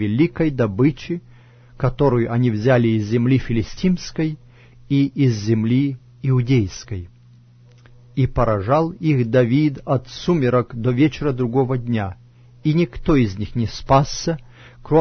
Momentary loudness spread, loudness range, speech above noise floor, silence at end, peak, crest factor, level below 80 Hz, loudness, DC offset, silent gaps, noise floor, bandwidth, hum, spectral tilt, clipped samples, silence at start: 9 LU; 2 LU; 30 dB; 0 s; -2 dBFS; 16 dB; -38 dBFS; -20 LUFS; under 0.1%; none; -48 dBFS; 6.6 kHz; none; -7.5 dB/octave; under 0.1%; 0 s